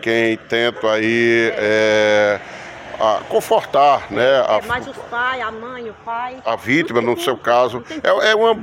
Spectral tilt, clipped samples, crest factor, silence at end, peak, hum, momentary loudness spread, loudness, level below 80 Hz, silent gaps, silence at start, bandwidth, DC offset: -4.5 dB/octave; under 0.1%; 14 dB; 0 s; -2 dBFS; none; 12 LU; -17 LUFS; -54 dBFS; none; 0 s; 16.5 kHz; under 0.1%